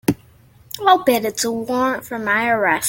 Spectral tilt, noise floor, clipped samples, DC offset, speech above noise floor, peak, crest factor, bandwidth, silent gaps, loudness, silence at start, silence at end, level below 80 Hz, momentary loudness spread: -3.5 dB/octave; -49 dBFS; under 0.1%; under 0.1%; 31 dB; -2 dBFS; 18 dB; 17 kHz; none; -18 LUFS; 0.1 s; 0 s; -56 dBFS; 9 LU